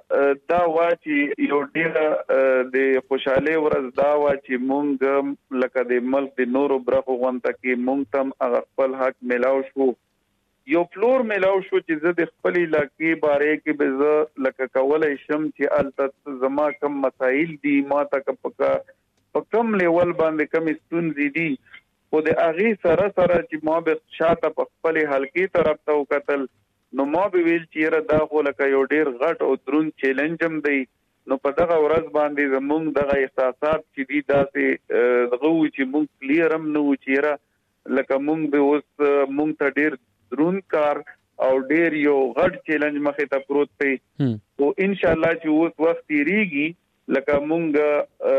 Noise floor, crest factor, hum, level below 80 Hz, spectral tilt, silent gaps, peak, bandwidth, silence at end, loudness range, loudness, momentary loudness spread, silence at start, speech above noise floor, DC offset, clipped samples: -70 dBFS; 12 dB; none; -56 dBFS; -8 dB/octave; none; -8 dBFS; 6.2 kHz; 0 s; 2 LU; -21 LUFS; 6 LU; 0.1 s; 49 dB; under 0.1%; under 0.1%